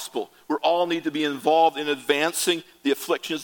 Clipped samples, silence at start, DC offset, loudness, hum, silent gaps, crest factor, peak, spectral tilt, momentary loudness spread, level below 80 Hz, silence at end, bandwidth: under 0.1%; 0 s; under 0.1%; -23 LUFS; none; none; 18 dB; -4 dBFS; -2.5 dB/octave; 7 LU; -74 dBFS; 0 s; 17.5 kHz